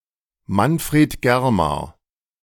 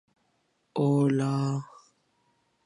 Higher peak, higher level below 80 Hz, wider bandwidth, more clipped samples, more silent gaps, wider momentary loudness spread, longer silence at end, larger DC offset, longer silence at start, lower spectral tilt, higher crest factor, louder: first, -4 dBFS vs -14 dBFS; first, -42 dBFS vs -76 dBFS; first, 18 kHz vs 11 kHz; neither; neither; about the same, 9 LU vs 11 LU; second, 0.5 s vs 1 s; neither; second, 0.5 s vs 0.75 s; second, -6 dB/octave vs -8 dB/octave; about the same, 16 dB vs 16 dB; first, -19 LUFS vs -27 LUFS